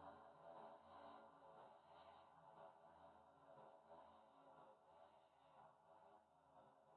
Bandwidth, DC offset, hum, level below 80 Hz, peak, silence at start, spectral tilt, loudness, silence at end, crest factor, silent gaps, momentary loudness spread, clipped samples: 4.3 kHz; under 0.1%; none; under -90 dBFS; -50 dBFS; 0 s; -3.5 dB/octave; -66 LUFS; 0 s; 18 dB; none; 6 LU; under 0.1%